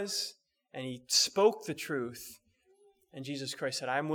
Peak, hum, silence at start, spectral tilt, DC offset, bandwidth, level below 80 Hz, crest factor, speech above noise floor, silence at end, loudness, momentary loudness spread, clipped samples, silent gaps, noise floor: -12 dBFS; none; 0 s; -2.5 dB/octave; under 0.1%; over 20 kHz; -78 dBFS; 22 dB; 34 dB; 0 s; -32 LUFS; 20 LU; under 0.1%; none; -67 dBFS